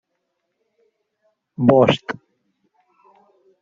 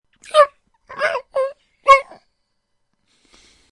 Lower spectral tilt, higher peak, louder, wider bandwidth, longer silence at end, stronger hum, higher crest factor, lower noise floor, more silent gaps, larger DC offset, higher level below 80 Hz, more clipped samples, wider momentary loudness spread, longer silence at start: first, -5.5 dB/octave vs -0.5 dB/octave; about the same, -2 dBFS vs 0 dBFS; about the same, -17 LUFS vs -17 LUFS; second, 7.6 kHz vs 11 kHz; second, 1.5 s vs 1.7 s; neither; about the same, 22 dB vs 20 dB; first, -75 dBFS vs -70 dBFS; neither; neither; about the same, -58 dBFS vs -54 dBFS; neither; first, 21 LU vs 11 LU; first, 1.6 s vs 0.35 s